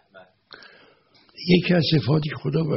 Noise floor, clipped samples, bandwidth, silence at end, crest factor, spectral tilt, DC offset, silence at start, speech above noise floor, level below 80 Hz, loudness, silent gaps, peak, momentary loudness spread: -57 dBFS; under 0.1%; 6 kHz; 0 s; 18 dB; -5.5 dB/octave; under 0.1%; 0.15 s; 37 dB; -54 dBFS; -21 LUFS; none; -4 dBFS; 7 LU